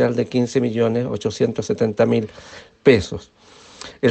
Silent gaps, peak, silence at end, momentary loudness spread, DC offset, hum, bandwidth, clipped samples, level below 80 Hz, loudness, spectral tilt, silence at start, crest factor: none; 0 dBFS; 0 s; 20 LU; under 0.1%; none; 8.6 kHz; under 0.1%; -52 dBFS; -19 LUFS; -6.5 dB/octave; 0 s; 20 dB